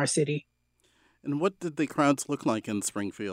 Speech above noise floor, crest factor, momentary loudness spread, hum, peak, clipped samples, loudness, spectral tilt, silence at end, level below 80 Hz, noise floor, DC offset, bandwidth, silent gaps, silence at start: 41 dB; 18 dB; 9 LU; 60 Hz at -65 dBFS; -12 dBFS; under 0.1%; -29 LUFS; -4.5 dB/octave; 0 s; -72 dBFS; -70 dBFS; under 0.1%; 16 kHz; none; 0 s